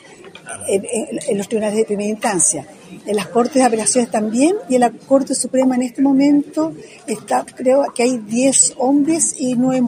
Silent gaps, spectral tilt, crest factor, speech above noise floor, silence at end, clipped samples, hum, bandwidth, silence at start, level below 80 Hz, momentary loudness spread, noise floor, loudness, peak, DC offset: none; -3.5 dB/octave; 16 dB; 22 dB; 0 s; under 0.1%; none; 16 kHz; 0.2 s; -64 dBFS; 9 LU; -38 dBFS; -16 LUFS; 0 dBFS; under 0.1%